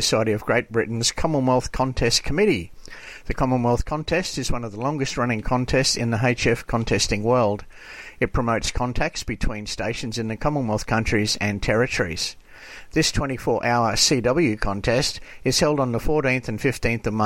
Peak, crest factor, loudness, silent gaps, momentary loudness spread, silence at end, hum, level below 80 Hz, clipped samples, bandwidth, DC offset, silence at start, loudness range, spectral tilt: -4 dBFS; 20 dB; -22 LUFS; none; 8 LU; 0 s; none; -34 dBFS; under 0.1%; 16.5 kHz; under 0.1%; 0 s; 4 LU; -4 dB/octave